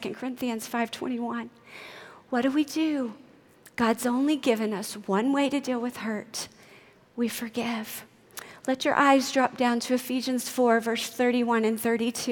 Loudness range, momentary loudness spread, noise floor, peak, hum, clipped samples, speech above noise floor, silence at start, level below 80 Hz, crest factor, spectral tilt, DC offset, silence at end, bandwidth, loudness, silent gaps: 6 LU; 17 LU; -55 dBFS; -6 dBFS; none; under 0.1%; 28 dB; 0 s; -72 dBFS; 20 dB; -3.5 dB/octave; under 0.1%; 0 s; 19 kHz; -27 LUFS; none